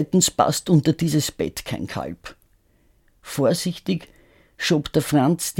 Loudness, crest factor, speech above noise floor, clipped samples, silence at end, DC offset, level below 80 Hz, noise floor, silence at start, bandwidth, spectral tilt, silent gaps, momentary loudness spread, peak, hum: -22 LUFS; 20 dB; 39 dB; under 0.1%; 0 s; under 0.1%; -50 dBFS; -60 dBFS; 0 s; 17.5 kHz; -5 dB/octave; none; 12 LU; -2 dBFS; none